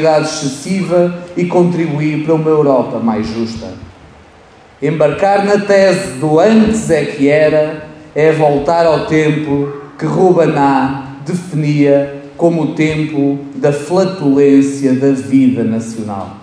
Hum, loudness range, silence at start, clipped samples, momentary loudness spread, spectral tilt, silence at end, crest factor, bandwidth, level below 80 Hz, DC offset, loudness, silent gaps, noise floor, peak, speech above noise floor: none; 3 LU; 0 s; under 0.1%; 11 LU; -6.5 dB/octave; 0 s; 12 dB; 11 kHz; -44 dBFS; under 0.1%; -13 LUFS; none; -41 dBFS; 0 dBFS; 29 dB